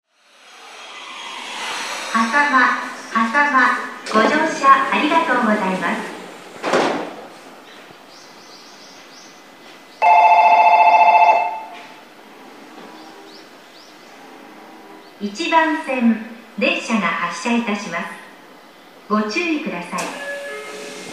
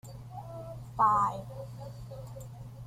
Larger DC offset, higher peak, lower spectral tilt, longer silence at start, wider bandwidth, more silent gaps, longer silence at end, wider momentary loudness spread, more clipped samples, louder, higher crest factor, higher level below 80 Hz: first, 0.1% vs under 0.1%; first, 0 dBFS vs -14 dBFS; second, -4 dB/octave vs -6.5 dB/octave; first, 0.6 s vs 0.05 s; about the same, 15 kHz vs 16 kHz; neither; about the same, 0 s vs 0 s; first, 24 LU vs 19 LU; neither; first, -17 LUFS vs -29 LUFS; about the same, 20 dB vs 20 dB; second, -74 dBFS vs -56 dBFS